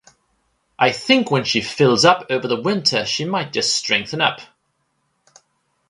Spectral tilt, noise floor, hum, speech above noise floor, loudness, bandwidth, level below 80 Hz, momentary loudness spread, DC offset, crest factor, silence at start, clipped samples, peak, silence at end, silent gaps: -3.5 dB/octave; -69 dBFS; none; 51 dB; -17 LUFS; 11.5 kHz; -60 dBFS; 7 LU; under 0.1%; 20 dB; 0.8 s; under 0.1%; 0 dBFS; 1.45 s; none